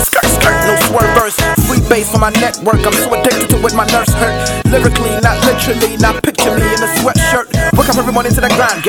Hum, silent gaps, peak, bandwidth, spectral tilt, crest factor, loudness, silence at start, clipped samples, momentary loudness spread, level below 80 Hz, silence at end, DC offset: none; none; 0 dBFS; 19.5 kHz; -4 dB/octave; 10 dB; -11 LUFS; 0 s; 0.2%; 3 LU; -22 dBFS; 0 s; under 0.1%